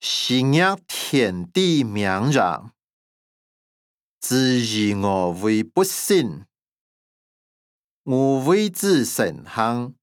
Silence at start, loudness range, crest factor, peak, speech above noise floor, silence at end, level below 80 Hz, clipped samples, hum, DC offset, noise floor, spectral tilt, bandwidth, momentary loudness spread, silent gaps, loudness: 0 s; 3 LU; 18 dB; -4 dBFS; over 70 dB; 0.1 s; -68 dBFS; under 0.1%; none; under 0.1%; under -90 dBFS; -4.5 dB/octave; 19.5 kHz; 6 LU; 2.93-4.18 s, 6.68-8.04 s; -20 LUFS